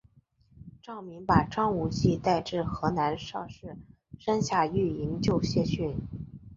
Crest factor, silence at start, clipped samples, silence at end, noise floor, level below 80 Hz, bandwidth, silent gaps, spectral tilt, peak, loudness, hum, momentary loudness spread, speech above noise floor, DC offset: 24 dB; 0.55 s; under 0.1%; 0 s; -63 dBFS; -48 dBFS; 7.8 kHz; none; -6.5 dB/octave; -6 dBFS; -29 LUFS; none; 17 LU; 35 dB; under 0.1%